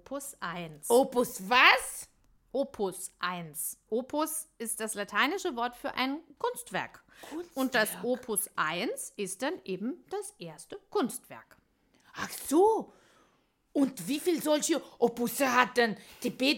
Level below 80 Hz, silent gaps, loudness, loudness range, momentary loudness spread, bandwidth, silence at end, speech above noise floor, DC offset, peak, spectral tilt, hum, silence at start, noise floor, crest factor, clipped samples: -68 dBFS; none; -30 LUFS; 7 LU; 15 LU; 17 kHz; 0 s; 40 dB; under 0.1%; -6 dBFS; -2.5 dB/octave; none; 0.1 s; -71 dBFS; 26 dB; under 0.1%